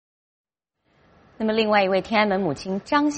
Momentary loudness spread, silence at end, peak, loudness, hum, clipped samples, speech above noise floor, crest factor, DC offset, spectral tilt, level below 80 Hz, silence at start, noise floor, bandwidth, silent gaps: 8 LU; 0 s; -6 dBFS; -22 LUFS; none; under 0.1%; 49 dB; 18 dB; under 0.1%; -5 dB/octave; -58 dBFS; 1.4 s; -71 dBFS; 8.4 kHz; none